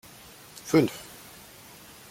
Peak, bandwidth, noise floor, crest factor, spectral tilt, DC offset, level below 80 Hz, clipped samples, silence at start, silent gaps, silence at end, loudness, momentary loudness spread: -10 dBFS; 16.5 kHz; -49 dBFS; 22 dB; -5.5 dB/octave; under 0.1%; -64 dBFS; under 0.1%; 0.65 s; none; 1.1 s; -25 LUFS; 23 LU